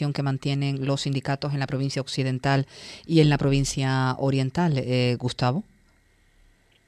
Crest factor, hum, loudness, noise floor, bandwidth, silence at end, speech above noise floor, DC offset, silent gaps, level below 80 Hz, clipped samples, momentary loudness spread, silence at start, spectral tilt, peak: 18 dB; none; -25 LUFS; -61 dBFS; 11 kHz; 1.25 s; 37 dB; under 0.1%; none; -48 dBFS; under 0.1%; 7 LU; 0 s; -6 dB/octave; -8 dBFS